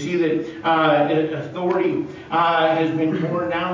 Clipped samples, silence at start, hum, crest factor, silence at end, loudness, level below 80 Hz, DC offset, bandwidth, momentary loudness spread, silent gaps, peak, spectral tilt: under 0.1%; 0 s; none; 14 dB; 0 s; -20 LUFS; -58 dBFS; under 0.1%; 7.6 kHz; 7 LU; none; -6 dBFS; -7 dB/octave